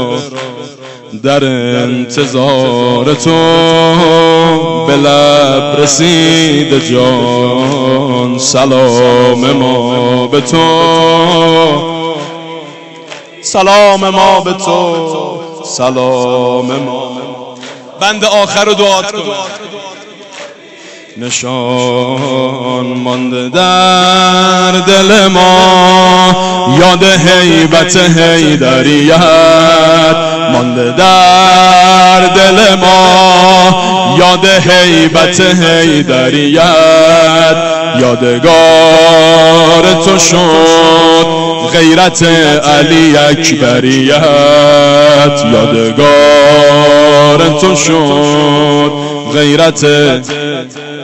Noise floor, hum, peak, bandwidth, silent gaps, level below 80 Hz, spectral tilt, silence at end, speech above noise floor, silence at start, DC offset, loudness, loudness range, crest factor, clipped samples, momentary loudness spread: -31 dBFS; none; 0 dBFS; 16 kHz; none; -40 dBFS; -4 dB/octave; 0 s; 25 dB; 0 s; under 0.1%; -6 LUFS; 7 LU; 6 dB; 0.8%; 12 LU